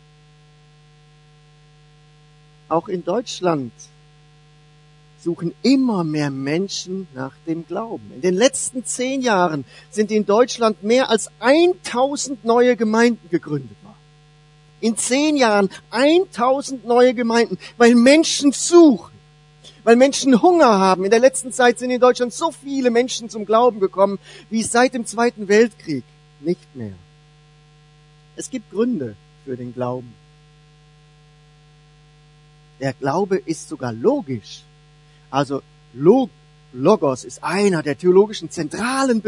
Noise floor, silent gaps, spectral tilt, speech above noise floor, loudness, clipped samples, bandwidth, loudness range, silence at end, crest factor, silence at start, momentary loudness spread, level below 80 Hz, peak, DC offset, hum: -50 dBFS; none; -4.5 dB/octave; 33 dB; -18 LUFS; under 0.1%; 11 kHz; 13 LU; 0 s; 20 dB; 2.7 s; 15 LU; -60 dBFS; 0 dBFS; under 0.1%; none